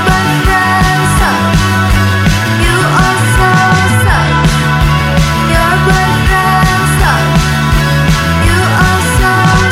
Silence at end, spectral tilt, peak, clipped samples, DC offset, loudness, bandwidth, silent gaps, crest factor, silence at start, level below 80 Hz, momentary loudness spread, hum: 0 s; -5 dB/octave; 0 dBFS; under 0.1%; under 0.1%; -9 LUFS; 16.5 kHz; none; 8 dB; 0 s; -18 dBFS; 2 LU; none